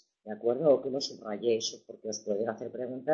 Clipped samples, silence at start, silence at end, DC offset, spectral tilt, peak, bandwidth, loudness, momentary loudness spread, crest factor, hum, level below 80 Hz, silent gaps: under 0.1%; 0.25 s; 0 s; under 0.1%; -4 dB/octave; -12 dBFS; 7.6 kHz; -31 LUFS; 12 LU; 18 dB; none; -78 dBFS; none